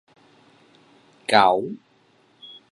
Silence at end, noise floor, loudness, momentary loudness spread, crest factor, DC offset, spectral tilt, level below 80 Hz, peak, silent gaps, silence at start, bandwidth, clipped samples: 0.25 s; -60 dBFS; -19 LUFS; 27 LU; 26 dB; under 0.1%; -4 dB/octave; -66 dBFS; 0 dBFS; none; 1.3 s; 11.5 kHz; under 0.1%